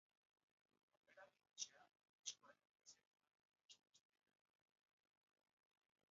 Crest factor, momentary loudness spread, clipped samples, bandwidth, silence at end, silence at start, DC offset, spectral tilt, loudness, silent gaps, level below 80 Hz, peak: 30 dB; 15 LU; under 0.1%; 7.4 kHz; 2.1 s; 1.1 s; under 0.1%; 2.5 dB/octave; -56 LUFS; 2.09-2.19 s, 3.07-3.11 s, 3.45-3.49 s, 3.65-3.69 s; under -90 dBFS; -36 dBFS